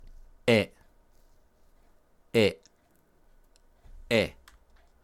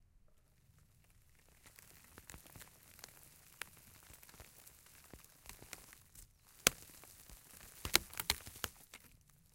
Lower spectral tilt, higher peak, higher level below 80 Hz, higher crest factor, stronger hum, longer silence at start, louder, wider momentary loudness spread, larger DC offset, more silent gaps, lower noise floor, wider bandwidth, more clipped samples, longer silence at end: first, -5.5 dB/octave vs -0.5 dB/octave; second, -10 dBFS vs -6 dBFS; first, -56 dBFS vs -64 dBFS; second, 22 dB vs 42 dB; neither; first, 0.45 s vs 0.15 s; first, -27 LUFS vs -39 LUFS; second, 11 LU vs 25 LU; neither; neither; second, -65 dBFS vs -69 dBFS; about the same, 16 kHz vs 17 kHz; neither; first, 0.75 s vs 0.4 s